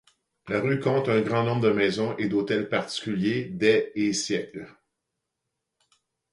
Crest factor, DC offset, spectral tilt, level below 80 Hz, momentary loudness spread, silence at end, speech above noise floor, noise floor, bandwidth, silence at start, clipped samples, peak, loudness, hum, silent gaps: 18 dB; under 0.1%; -5.5 dB/octave; -64 dBFS; 7 LU; 1.6 s; 58 dB; -83 dBFS; 11.5 kHz; 0.45 s; under 0.1%; -8 dBFS; -25 LUFS; none; none